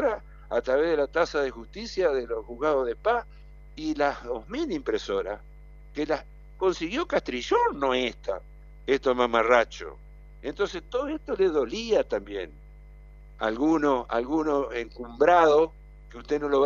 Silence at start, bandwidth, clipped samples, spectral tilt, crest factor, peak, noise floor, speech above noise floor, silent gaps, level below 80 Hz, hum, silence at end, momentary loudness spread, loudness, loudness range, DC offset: 0 s; 7.4 kHz; under 0.1%; -5 dB/octave; 22 dB; -4 dBFS; -47 dBFS; 21 dB; none; -48 dBFS; 50 Hz at -45 dBFS; 0 s; 14 LU; -26 LUFS; 5 LU; under 0.1%